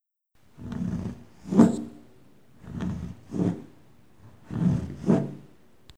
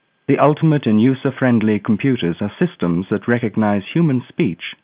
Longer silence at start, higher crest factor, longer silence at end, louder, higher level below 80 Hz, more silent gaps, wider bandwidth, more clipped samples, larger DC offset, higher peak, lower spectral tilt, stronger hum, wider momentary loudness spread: first, 0.6 s vs 0.3 s; first, 26 dB vs 16 dB; first, 0.55 s vs 0.1 s; second, -27 LUFS vs -17 LUFS; about the same, -50 dBFS vs -52 dBFS; neither; first, 10 kHz vs 4 kHz; neither; first, 0.2% vs under 0.1%; about the same, -2 dBFS vs 0 dBFS; second, -8.5 dB/octave vs -12 dB/octave; neither; first, 21 LU vs 6 LU